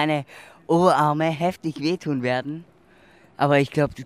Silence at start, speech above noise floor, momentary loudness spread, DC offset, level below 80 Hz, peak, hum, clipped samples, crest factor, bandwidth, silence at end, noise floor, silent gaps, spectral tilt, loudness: 0 s; 32 dB; 16 LU; under 0.1%; -58 dBFS; -4 dBFS; none; under 0.1%; 20 dB; 15 kHz; 0 s; -54 dBFS; none; -6.5 dB/octave; -22 LUFS